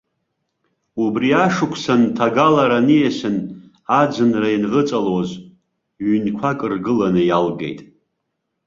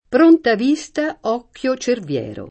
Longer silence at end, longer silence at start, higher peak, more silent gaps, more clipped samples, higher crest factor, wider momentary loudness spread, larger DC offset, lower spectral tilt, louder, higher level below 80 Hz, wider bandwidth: first, 0.85 s vs 0.05 s; first, 0.95 s vs 0.1 s; about the same, -2 dBFS vs -2 dBFS; neither; neither; about the same, 16 dB vs 16 dB; about the same, 13 LU vs 11 LU; neither; first, -6.5 dB/octave vs -5 dB/octave; about the same, -17 LUFS vs -18 LUFS; about the same, -56 dBFS vs -56 dBFS; second, 7.6 kHz vs 8.6 kHz